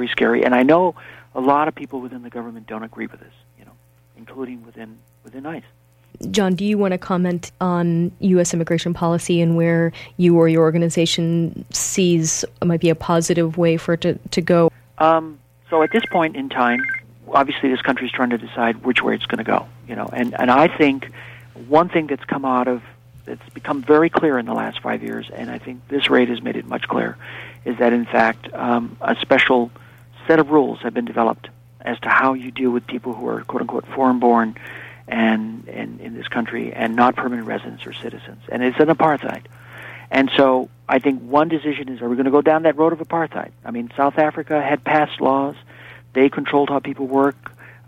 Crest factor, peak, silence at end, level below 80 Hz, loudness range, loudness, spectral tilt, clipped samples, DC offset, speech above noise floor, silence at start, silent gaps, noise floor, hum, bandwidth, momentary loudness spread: 16 dB; -2 dBFS; 0.15 s; -56 dBFS; 5 LU; -19 LUFS; -5.5 dB/octave; under 0.1%; under 0.1%; 33 dB; 0 s; none; -52 dBFS; none; 15 kHz; 17 LU